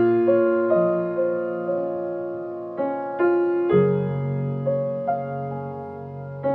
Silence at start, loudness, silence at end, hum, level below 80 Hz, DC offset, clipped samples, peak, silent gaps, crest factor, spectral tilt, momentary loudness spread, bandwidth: 0 s; -23 LUFS; 0 s; none; -66 dBFS; under 0.1%; under 0.1%; -8 dBFS; none; 14 dB; -11.5 dB/octave; 12 LU; 3.8 kHz